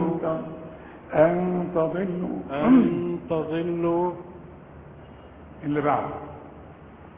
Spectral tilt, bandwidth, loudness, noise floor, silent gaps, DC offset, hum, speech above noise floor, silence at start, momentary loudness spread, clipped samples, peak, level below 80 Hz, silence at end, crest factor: -12 dB/octave; 3.8 kHz; -24 LUFS; -45 dBFS; none; under 0.1%; none; 22 dB; 0 s; 26 LU; under 0.1%; -6 dBFS; -52 dBFS; 0 s; 20 dB